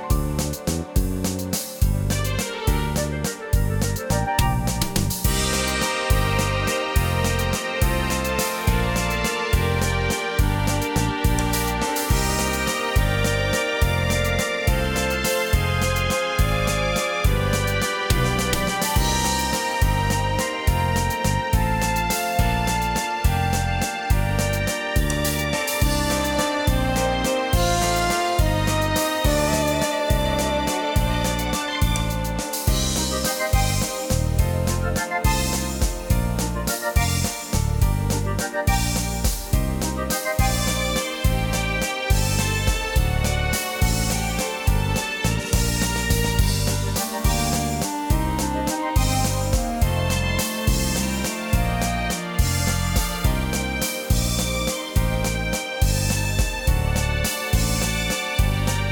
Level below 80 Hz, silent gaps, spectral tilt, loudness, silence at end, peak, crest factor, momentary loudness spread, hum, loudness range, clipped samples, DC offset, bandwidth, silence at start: -26 dBFS; none; -4 dB/octave; -22 LUFS; 0 s; -8 dBFS; 14 dB; 3 LU; none; 2 LU; under 0.1%; under 0.1%; 19 kHz; 0 s